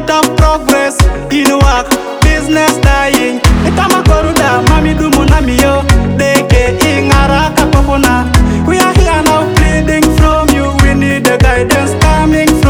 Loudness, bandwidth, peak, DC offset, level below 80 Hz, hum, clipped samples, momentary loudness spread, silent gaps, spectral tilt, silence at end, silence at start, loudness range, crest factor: -9 LUFS; over 20 kHz; 0 dBFS; under 0.1%; -14 dBFS; none; 0.6%; 2 LU; none; -5 dB/octave; 0 s; 0 s; 1 LU; 8 dB